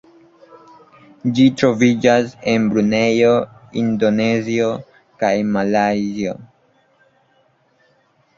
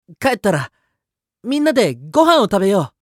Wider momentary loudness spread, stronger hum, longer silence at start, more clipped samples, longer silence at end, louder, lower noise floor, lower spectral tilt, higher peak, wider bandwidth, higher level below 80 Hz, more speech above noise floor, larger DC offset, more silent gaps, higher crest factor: about the same, 10 LU vs 10 LU; neither; first, 1.25 s vs 0.1 s; neither; first, 1.9 s vs 0.15 s; about the same, -17 LUFS vs -16 LUFS; second, -59 dBFS vs -81 dBFS; about the same, -6 dB/octave vs -5.5 dB/octave; about the same, 0 dBFS vs 0 dBFS; second, 7.6 kHz vs 16.5 kHz; about the same, -56 dBFS vs -54 dBFS; second, 43 dB vs 65 dB; neither; neither; about the same, 18 dB vs 16 dB